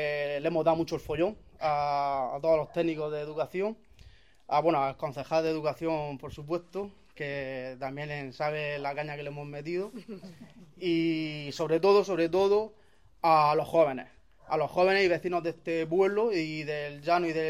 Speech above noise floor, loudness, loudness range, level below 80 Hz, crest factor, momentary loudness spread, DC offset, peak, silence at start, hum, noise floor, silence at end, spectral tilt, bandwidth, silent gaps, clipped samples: 28 dB; -29 LUFS; 8 LU; -62 dBFS; 18 dB; 14 LU; 0.1%; -10 dBFS; 0 s; none; -56 dBFS; 0 s; -6 dB/octave; 14 kHz; none; under 0.1%